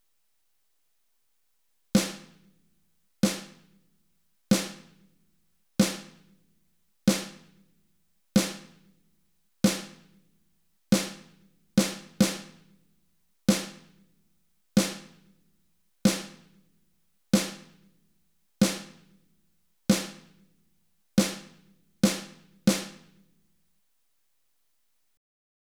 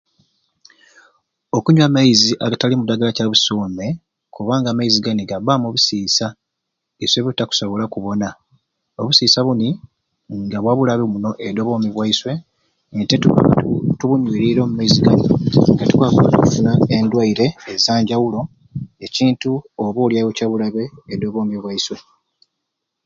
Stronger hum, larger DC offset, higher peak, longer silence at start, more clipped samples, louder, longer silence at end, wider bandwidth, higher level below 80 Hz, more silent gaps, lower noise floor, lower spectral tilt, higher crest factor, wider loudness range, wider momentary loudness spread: neither; neither; second, -8 dBFS vs 0 dBFS; first, 1.95 s vs 1.55 s; neither; second, -28 LUFS vs -16 LUFS; first, 2.7 s vs 1.05 s; first, 19 kHz vs 7.6 kHz; second, -62 dBFS vs -48 dBFS; neither; about the same, -77 dBFS vs -78 dBFS; about the same, -4.5 dB/octave vs -5.5 dB/octave; first, 24 dB vs 18 dB; second, 3 LU vs 6 LU; first, 17 LU vs 13 LU